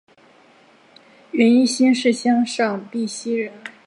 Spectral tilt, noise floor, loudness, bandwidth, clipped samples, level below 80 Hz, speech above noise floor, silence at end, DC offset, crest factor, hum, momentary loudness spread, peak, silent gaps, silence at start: -4 dB/octave; -52 dBFS; -19 LUFS; 11 kHz; under 0.1%; -74 dBFS; 34 dB; 0.15 s; under 0.1%; 16 dB; none; 11 LU; -4 dBFS; none; 1.35 s